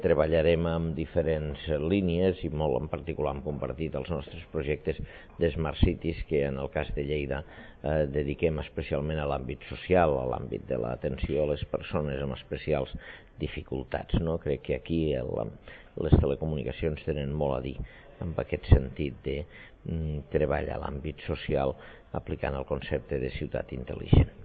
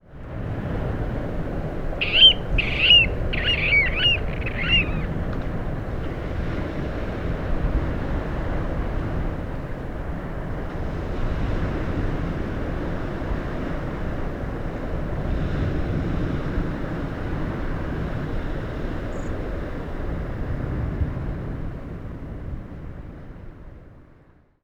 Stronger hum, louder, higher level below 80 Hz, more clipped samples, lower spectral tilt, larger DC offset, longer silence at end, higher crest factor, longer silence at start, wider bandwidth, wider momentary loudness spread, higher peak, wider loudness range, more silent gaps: neither; second, -30 LUFS vs -24 LUFS; second, -38 dBFS vs -30 dBFS; neither; first, -11 dB/octave vs -6 dB/octave; neither; second, 0 s vs 0.5 s; about the same, 24 dB vs 22 dB; about the same, 0 s vs 0.05 s; second, 4.8 kHz vs 7.6 kHz; about the same, 13 LU vs 14 LU; about the same, -4 dBFS vs -4 dBFS; second, 3 LU vs 14 LU; neither